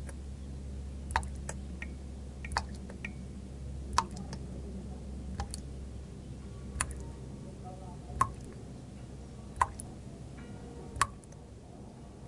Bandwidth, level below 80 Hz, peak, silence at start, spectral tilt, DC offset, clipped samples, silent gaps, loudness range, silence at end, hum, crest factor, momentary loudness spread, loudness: 11.5 kHz; -46 dBFS; -8 dBFS; 0 s; -4.5 dB/octave; under 0.1%; under 0.1%; none; 3 LU; 0 s; none; 32 dB; 13 LU; -40 LUFS